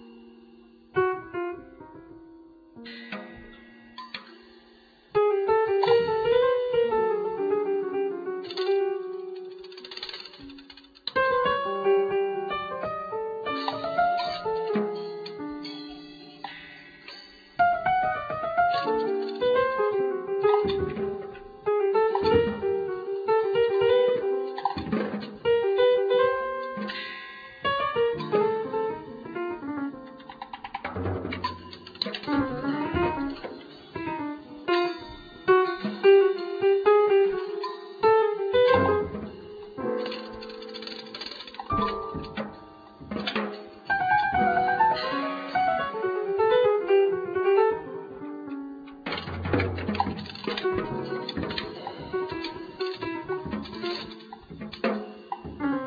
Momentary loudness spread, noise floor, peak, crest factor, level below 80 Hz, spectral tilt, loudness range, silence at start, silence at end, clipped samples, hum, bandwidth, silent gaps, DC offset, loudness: 18 LU; -56 dBFS; -8 dBFS; 20 dB; -56 dBFS; -7 dB/octave; 10 LU; 0 s; 0 s; under 0.1%; none; 5 kHz; none; under 0.1%; -26 LUFS